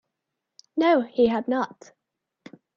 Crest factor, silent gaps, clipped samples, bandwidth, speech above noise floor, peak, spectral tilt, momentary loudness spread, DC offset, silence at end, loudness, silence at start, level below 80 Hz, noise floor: 18 dB; none; under 0.1%; 7.2 kHz; 60 dB; -8 dBFS; -6 dB/octave; 11 LU; under 0.1%; 1.1 s; -23 LUFS; 0.75 s; -68 dBFS; -83 dBFS